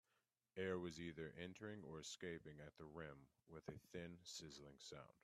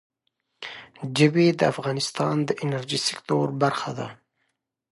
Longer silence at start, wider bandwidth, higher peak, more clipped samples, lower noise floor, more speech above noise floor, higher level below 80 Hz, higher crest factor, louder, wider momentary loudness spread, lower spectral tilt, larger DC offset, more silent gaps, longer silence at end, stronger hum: about the same, 0.55 s vs 0.6 s; first, 13 kHz vs 11.5 kHz; second, -32 dBFS vs -4 dBFS; neither; first, -89 dBFS vs -76 dBFS; second, 35 dB vs 53 dB; second, -78 dBFS vs -68 dBFS; about the same, 22 dB vs 22 dB; second, -54 LUFS vs -24 LUFS; second, 11 LU vs 18 LU; about the same, -4.5 dB/octave vs -5 dB/octave; neither; neither; second, 0.15 s vs 0.8 s; neither